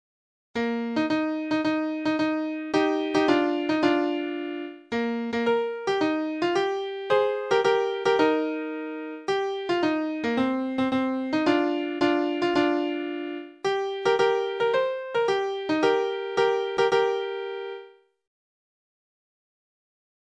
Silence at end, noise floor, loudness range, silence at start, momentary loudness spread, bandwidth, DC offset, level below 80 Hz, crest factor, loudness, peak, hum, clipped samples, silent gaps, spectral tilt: 2.35 s; -48 dBFS; 2 LU; 0.55 s; 9 LU; 9.4 kHz; under 0.1%; -66 dBFS; 18 dB; -25 LUFS; -8 dBFS; none; under 0.1%; none; -5 dB/octave